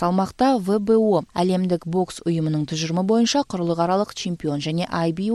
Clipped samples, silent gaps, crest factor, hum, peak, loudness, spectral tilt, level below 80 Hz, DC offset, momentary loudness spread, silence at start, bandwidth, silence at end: under 0.1%; none; 14 dB; none; -6 dBFS; -22 LUFS; -6 dB/octave; -54 dBFS; under 0.1%; 6 LU; 0 s; 12.5 kHz; 0 s